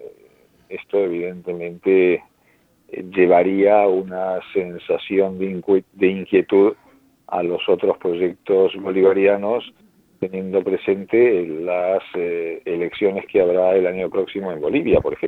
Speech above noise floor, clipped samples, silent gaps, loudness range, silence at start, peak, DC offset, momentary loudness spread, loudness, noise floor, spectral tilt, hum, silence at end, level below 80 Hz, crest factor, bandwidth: 40 dB; under 0.1%; none; 2 LU; 0 s; -2 dBFS; under 0.1%; 11 LU; -19 LUFS; -59 dBFS; -8.5 dB/octave; none; 0 s; -52 dBFS; 18 dB; 4.1 kHz